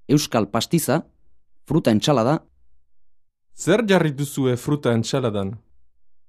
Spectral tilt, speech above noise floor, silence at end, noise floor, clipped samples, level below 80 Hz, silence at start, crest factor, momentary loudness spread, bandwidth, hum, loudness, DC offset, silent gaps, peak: -5.5 dB/octave; 33 dB; 0.7 s; -53 dBFS; under 0.1%; -56 dBFS; 0.1 s; 18 dB; 8 LU; 14 kHz; none; -21 LUFS; under 0.1%; none; -4 dBFS